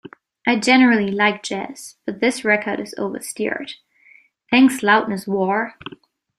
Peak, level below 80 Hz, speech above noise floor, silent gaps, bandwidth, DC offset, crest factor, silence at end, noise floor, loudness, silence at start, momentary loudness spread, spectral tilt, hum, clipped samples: -2 dBFS; -64 dBFS; 34 dB; none; 14 kHz; under 0.1%; 18 dB; 0.5 s; -53 dBFS; -18 LUFS; 0.45 s; 17 LU; -4 dB/octave; none; under 0.1%